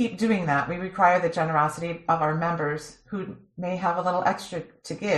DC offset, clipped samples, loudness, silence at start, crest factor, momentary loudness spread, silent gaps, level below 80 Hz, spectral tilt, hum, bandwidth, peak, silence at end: under 0.1%; under 0.1%; -25 LUFS; 0 s; 18 dB; 14 LU; none; -60 dBFS; -6 dB/octave; none; 13 kHz; -8 dBFS; 0 s